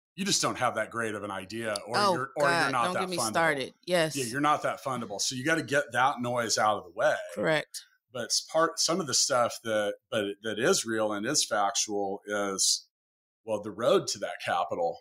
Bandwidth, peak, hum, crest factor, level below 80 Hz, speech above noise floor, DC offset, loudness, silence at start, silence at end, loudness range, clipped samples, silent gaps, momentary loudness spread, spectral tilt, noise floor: 16 kHz; -12 dBFS; none; 18 dB; -72 dBFS; over 61 dB; under 0.1%; -28 LUFS; 0.15 s; 0 s; 1 LU; under 0.1%; 12.90-13.44 s; 8 LU; -2.5 dB/octave; under -90 dBFS